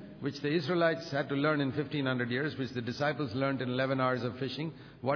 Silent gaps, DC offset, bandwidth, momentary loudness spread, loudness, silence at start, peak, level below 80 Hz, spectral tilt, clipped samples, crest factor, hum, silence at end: none; under 0.1%; 5.4 kHz; 7 LU; -32 LUFS; 0 s; -14 dBFS; -68 dBFS; -5 dB/octave; under 0.1%; 18 dB; none; 0 s